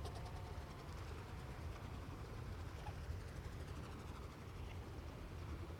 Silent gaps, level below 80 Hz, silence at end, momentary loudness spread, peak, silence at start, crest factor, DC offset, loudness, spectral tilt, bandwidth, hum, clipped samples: none; -54 dBFS; 0 s; 2 LU; -36 dBFS; 0 s; 14 dB; under 0.1%; -51 LUFS; -6 dB/octave; 18 kHz; none; under 0.1%